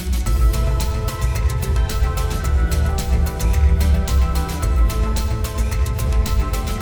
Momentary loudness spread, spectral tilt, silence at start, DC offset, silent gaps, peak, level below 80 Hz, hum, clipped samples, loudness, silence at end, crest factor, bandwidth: 4 LU; -5.5 dB/octave; 0 s; under 0.1%; none; -6 dBFS; -18 dBFS; none; under 0.1%; -20 LUFS; 0 s; 12 dB; over 20 kHz